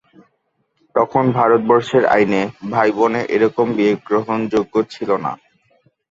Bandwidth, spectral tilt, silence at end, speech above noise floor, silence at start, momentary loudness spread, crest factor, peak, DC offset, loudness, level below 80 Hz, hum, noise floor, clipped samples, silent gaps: 7.8 kHz; -7 dB/octave; 0.75 s; 51 dB; 0.95 s; 7 LU; 16 dB; -2 dBFS; under 0.1%; -17 LUFS; -56 dBFS; none; -67 dBFS; under 0.1%; none